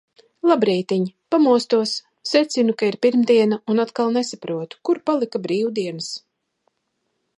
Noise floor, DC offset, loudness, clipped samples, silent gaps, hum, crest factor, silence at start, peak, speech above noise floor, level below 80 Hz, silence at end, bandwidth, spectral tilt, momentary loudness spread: -73 dBFS; under 0.1%; -20 LUFS; under 0.1%; none; none; 18 dB; 0.45 s; -4 dBFS; 54 dB; -74 dBFS; 1.2 s; 11.5 kHz; -5 dB/octave; 10 LU